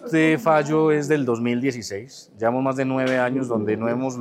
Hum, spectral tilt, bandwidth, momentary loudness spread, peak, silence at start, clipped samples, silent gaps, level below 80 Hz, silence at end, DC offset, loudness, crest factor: none; -6.5 dB/octave; 15.5 kHz; 9 LU; -6 dBFS; 0 s; under 0.1%; none; -70 dBFS; 0 s; under 0.1%; -21 LUFS; 16 dB